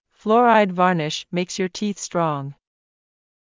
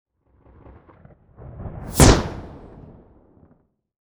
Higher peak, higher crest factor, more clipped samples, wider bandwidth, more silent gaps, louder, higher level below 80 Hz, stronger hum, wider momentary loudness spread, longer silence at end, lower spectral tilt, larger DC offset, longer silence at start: second, -4 dBFS vs 0 dBFS; second, 18 dB vs 24 dB; neither; second, 7.6 kHz vs over 20 kHz; neither; second, -20 LUFS vs -17 LUFS; second, -68 dBFS vs -30 dBFS; neither; second, 11 LU vs 28 LU; second, 0.9 s vs 1.55 s; about the same, -5 dB/octave vs -4.5 dB/octave; neither; second, 0.25 s vs 1.6 s